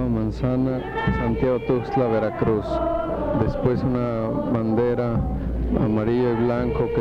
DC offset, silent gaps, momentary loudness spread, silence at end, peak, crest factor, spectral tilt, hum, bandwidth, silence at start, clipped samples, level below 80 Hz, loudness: under 0.1%; none; 3 LU; 0 s; -8 dBFS; 14 dB; -9.5 dB/octave; none; 6.8 kHz; 0 s; under 0.1%; -34 dBFS; -23 LUFS